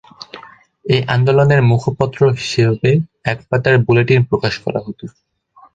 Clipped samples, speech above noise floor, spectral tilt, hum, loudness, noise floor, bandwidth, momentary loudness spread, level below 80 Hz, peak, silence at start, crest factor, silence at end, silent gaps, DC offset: under 0.1%; 27 dB; -7 dB/octave; none; -15 LUFS; -41 dBFS; 7.8 kHz; 19 LU; -46 dBFS; -2 dBFS; 0.2 s; 14 dB; 0.65 s; none; under 0.1%